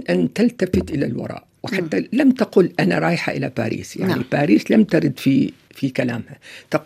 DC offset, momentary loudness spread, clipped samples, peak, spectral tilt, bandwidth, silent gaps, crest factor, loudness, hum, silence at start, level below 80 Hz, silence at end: under 0.1%; 11 LU; under 0.1%; -2 dBFS; -7 dB/octave; 14.5 kHz; none; 18 dB; -19 LUFS; none; 0 s; -52 dBFS; 0 s